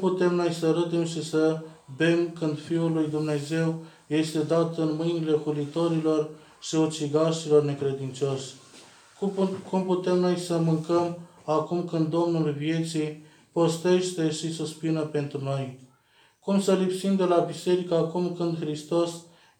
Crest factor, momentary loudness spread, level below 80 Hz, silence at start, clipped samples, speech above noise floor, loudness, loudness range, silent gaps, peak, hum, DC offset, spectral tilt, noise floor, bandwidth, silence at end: 18 dB; 8 LU; -76 dBFS; 0 s; under 0.1%; 36 dB; -26 LUFS; 2 LU; none; -8 dBFS; none; under 0.1%; -6.5 dB/octave; -62 dBFS; 13.5 kHz; 0.35 s